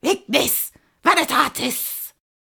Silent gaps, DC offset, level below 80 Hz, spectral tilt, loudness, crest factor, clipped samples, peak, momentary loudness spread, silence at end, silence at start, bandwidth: none; under 0.1%; -58 dBFS; -1.5 dB/octave; -19 LUFS; 20 dB; under 0.1%; -2 dBFS; 12 LU; 0.4 s; 0.05 s; over 20 kHz